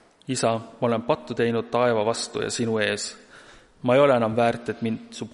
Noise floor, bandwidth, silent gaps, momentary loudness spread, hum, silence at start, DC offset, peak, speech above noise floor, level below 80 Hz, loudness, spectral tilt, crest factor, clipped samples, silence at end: -50 dBFS; 11.5 kHz; none; 10 LU; none; 0.3 s; under 0.1%; -6 dBFS; 26 dB; -62 dBFS; -24 LUFS; -4.5 dB/octave; 18 dB; under 0.1%; 0.05 s